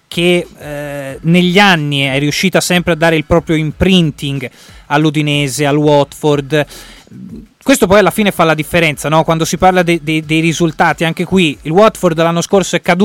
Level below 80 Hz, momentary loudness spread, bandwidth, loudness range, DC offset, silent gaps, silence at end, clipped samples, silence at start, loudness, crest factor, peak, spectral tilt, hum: -36 dBFS; 11 LU; 17 kHz; 2 LU; under 0.1%; none; 0 s; under 0.1%; 0.1 s; -12 LUFS; 12 dB; 0 dBFS; -5 dB/octave; none